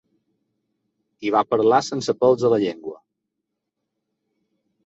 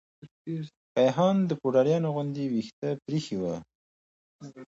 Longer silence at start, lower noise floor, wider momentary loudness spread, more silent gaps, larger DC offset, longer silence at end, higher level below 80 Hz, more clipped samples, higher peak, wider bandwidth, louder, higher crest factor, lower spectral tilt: first, 1.2 s vs 0.25 s; second, -81 dBFS vs under -90 dBFS; about the same, 13 LU vs 14 LU; second, none vs 0.31-0.45 s, 0.77-0.95 s, 2.73-2.82 s, 3.75-4.39 s; neither; first, 1.9 s vs 0.05 s; about the same, -66 dBFS vs -68 dBFS; neither; first, -4 dBFS vs -10 dBFS; about the same, 8 kHz vs 8 kHz; first, -20 LUFS vs -28 LUFS; about the same, 20 dB vs 18 dB; second, -5.5 dB/octave vs -7.5 dB/octave